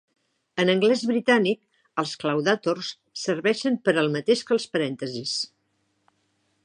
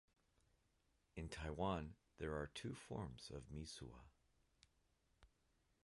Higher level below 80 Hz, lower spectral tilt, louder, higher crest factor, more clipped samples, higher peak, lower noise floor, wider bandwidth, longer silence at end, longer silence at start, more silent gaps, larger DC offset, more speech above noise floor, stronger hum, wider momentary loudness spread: second, -76 dBFS vs -62 dBFS; about the same, -4.5 dB/octave vs -5.5 dB/octave; first, -24 LUFS vs -50 LUFS; about the same, 20 dB vs 22 dB; neither; first, -6 dBFS vs -32 dBFS; second, -72 dBFS vs -82 dBFS; about the same, 10.5 kHz vs 11.5 kHz; first, 1.2 s vs 0.6 s; second, 0.55 s vs 1.15 s; neither; neither; first, 48 dB vs 33 dB; neither; about the same, 11 LU vs 13 LU